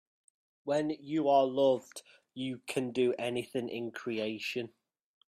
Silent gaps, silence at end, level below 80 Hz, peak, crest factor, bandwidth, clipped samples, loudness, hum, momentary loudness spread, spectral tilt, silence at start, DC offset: none; 0.6 s; -78 dBFS; -14 dBFS; 18 dB; 14 kHz; under 0.1%; -32 LUFS; none; 17 LU; -5.5 dB/octave; 0.65 s; under 0.1%